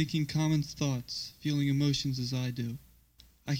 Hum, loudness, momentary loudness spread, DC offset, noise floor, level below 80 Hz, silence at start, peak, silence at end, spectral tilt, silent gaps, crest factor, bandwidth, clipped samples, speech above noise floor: none; -32 LUFS; 10 LU; under 0.1%; -61 dBFS; -58 dBFS; 0 s; -16 dBFS; 0 s; -5.5 dB/octave; none; 16 dB; 16.5 kHz; under 0.1%; 30 dB